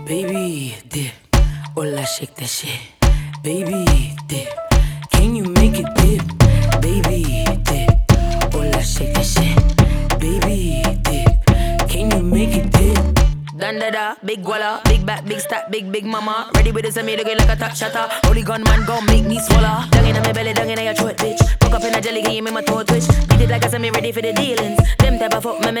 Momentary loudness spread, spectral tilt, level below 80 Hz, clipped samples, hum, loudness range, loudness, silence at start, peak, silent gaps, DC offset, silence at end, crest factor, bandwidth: 9 LU; -5 dB/octave; -20 dBFS; under 0.1%; none; 4 LU; -17 LUFS; 0 s; 0 dBFS; none; under 0.1%; 0 s; 16 dB; over 20 kHz